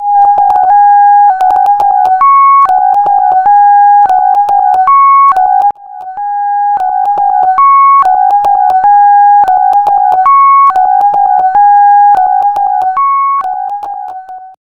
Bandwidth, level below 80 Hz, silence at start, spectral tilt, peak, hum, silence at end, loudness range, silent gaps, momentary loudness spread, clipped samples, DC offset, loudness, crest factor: 4.4 kHz; -50 dBFS; 0 s; -4 dB/octave; 0 dBFS; none; 0.15 s; 3 LU; none; 9 LU; 0.2%; under 0.1%; -6 LUFS; 6 dB